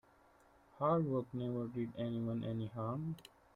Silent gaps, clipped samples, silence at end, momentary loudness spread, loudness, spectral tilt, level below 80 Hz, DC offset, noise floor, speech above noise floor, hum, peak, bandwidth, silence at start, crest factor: none; under 0.1%; 0.35 s; 8 LU; -39 LUFS; -9.5 dB/octave; -70 dBFS; under 0.1%; -67 dBFS; 29 dB; none; -22 dBFS; 13 kHz; 0.75 s; 18 dB